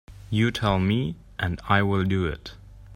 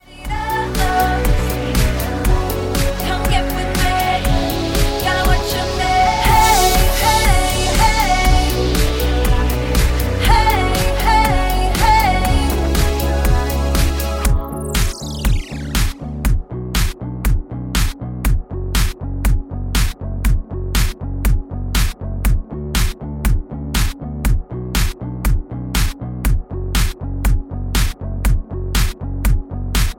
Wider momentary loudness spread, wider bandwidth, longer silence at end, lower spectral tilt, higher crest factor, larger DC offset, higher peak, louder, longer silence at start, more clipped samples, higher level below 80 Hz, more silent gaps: about the same, 9 LU vs 9 LU; second, 15 kHz vs 17 kHz; about the same, 0 s vs 0.05 s; first, -7 dB/octave vs -4.5 dB/octave; about the same, 20 dB vs 16 dB; neither; second, -4 dBFS vs 0 dBFS; second, -25 LUFS vs -18 LUFS; about the same, 0.1 s vs 0.1 s; neither; second, -44 dBFS vs -18 dBFS; neither